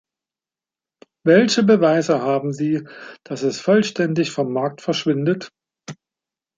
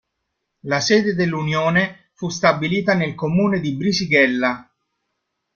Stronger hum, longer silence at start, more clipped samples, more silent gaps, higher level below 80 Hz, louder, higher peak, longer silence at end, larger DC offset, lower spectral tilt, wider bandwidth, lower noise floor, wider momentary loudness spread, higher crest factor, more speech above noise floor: neither; first, 1.25 s vs 0.65 s; neither; neither; second, -68 dBFS vs -56 dBFS; about the same, -19 LUFS vs -19 LUFS; about the same, -2 dBFS vs 0 dBFS; second, 0.65 s vs 0.95 s; neither; about the same, -5.5 dB/octave vs -5 dB/octave; first, 9.4 kHz vs 7.2 kHz; first, under -90 dBFS vs -76 dBFS; first, 23 LU vs 10 LU; about the same, 18 dB vs 20 dB; first, over 72 dB vs 58 dB